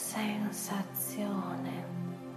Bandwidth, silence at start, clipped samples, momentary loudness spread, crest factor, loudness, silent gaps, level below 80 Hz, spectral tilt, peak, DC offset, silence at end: 14.5 kHz; 0 s; under 0.1%; 5 LU; 16 dB; -36 LUFS; none; -76 dBFS; -4.5 dB/octave; -20 dBFS; under 0.1%; 0 s